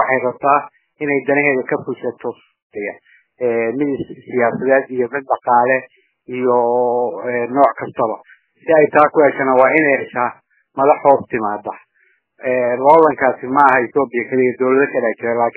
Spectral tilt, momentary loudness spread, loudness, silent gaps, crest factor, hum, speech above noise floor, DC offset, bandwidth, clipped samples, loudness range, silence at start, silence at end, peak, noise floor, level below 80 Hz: -10 dB/octave; 14 LU; -16 LUFS; 2.62-2.70 s; 16 dB; none; 44 dB; under 0.1%; 4 kHz; under 0.1%; 6 LU; 0 s; 0.05 s; 0 dBFS; -60 dBFS; -64 dBFS